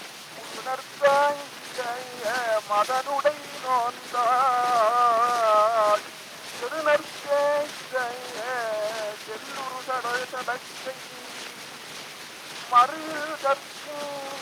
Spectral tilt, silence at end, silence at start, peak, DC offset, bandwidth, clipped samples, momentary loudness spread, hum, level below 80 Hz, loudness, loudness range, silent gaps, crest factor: -1.5 dB/octave; 0 s; 0 s; -8 dBFS; under 0.1%; over 20 kHz; under 0.1%; 17 LU; none; -76 dBFS; -25 LUFS; 9 LU; none; 20 dB